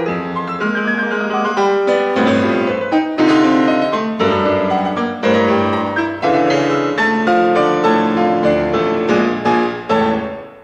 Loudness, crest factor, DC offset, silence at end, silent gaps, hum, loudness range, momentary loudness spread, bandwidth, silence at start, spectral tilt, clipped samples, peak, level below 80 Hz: -15 LUFS; 12 dB; under 0.1%; 0 s; none; none; 1 LU; 5 LU; 9.2 kHz; 0 s; -6 dB/octave; under 0.1%; -4 dBFS; -48 dBFS